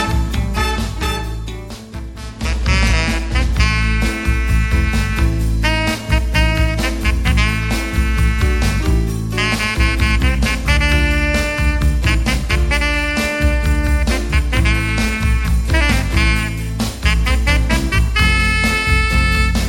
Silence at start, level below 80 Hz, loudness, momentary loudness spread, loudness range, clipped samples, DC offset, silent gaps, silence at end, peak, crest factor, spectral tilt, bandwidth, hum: 0 s; -18 dBFS; -16 LUFS; 6 LU; 2 LU; under 0.1%; under 0.1%; none; 0 s; 0 dBFS; 14 dB; -5 dB/octave; 16.5 kHz; none